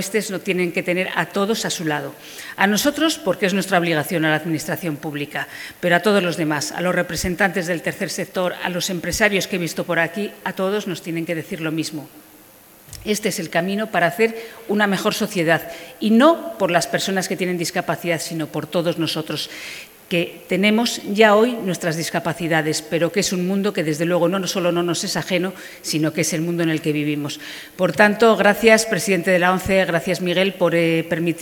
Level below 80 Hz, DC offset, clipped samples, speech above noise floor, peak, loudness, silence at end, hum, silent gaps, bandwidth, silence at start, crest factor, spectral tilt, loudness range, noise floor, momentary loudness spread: -52 dBFS; under 0.1%; under 0.1%; 27 dB; 0 dBFS; -20 LUFS; 0 s; none; none; over 20 kHz; 0 s; 20 dB; -4.5 dB/octave; 6 LU; -47 dBFS; 10 LU